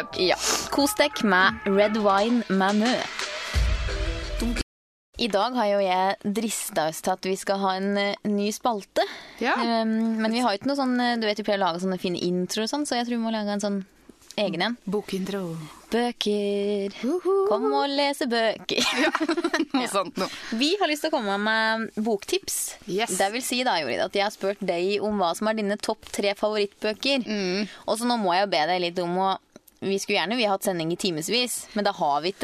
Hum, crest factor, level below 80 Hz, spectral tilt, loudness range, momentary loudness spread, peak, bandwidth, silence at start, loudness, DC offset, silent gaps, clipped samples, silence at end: none; 20 dB; -42 dBFS; -3.5 dB/octave; 3 LU; 7 LU; -6 dBFS; 14 kHz; 0 s; -25 LUFS; under 0.1%; 4.63-5.13 s; under 0.1%; 0 s